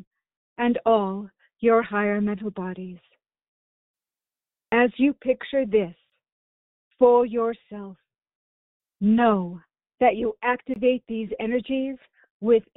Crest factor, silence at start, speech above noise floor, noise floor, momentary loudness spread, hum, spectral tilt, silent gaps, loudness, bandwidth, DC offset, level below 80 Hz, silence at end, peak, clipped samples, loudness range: 20 dB; 0.6 s; over 68 dB; under -90 dBFS; 16 LU; none; -5 dB/octave; 3.48-3.94 s, 6.32-6.91 s, 8.35-8.80 s, 12.30-12.40 s; -23 LUFS; 4 kHz; under 0.1%; -60 dBFS; 0.15 s; -6 dBFS; under 0.1%; 4 LU